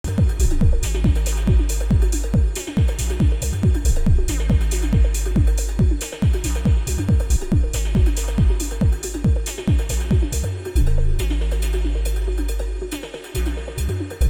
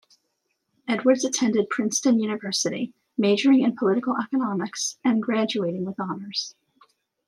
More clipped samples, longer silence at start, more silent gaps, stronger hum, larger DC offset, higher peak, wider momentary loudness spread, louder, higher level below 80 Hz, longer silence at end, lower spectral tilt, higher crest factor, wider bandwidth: neither; second, 0.05 s vs 0.85 s; neither; neither; neither; about the same, -6 dBFS vs -8 dBFS; second, 6 LU vs 10 LU; first, -21 LUFS vs -24 LUFS; first, -20 dBFS vs -76 dBFS; second, 0 s vs 0.8 s; first, -6 dB/octave vs -4 dB/octave; second, 12 dB vs 18 dB; first, 16.5 kHz vs 12.5 kHz